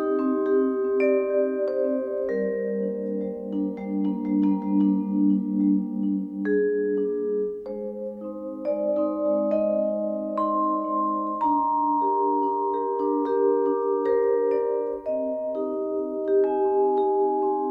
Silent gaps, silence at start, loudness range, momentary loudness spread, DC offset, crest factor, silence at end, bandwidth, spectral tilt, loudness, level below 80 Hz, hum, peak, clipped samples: none; 0 s; 3 LU; 6 LU; under 0.1%; 12 dB; 0 s; 4.9 kHz; -11 dB/octave; -25 LUFS; -64 dBFS; none; -12 dBFS; under 0.1%